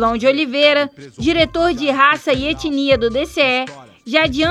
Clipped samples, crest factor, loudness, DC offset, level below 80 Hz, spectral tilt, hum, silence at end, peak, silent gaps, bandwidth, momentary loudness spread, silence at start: under 0.1%; 16 dB; -16 LUFS; under 0.1%; -40 dBFS; -4.5 dB/octave; none; 0 s; -2 dBFS; none; 13 kHz; 6 LU; 0 s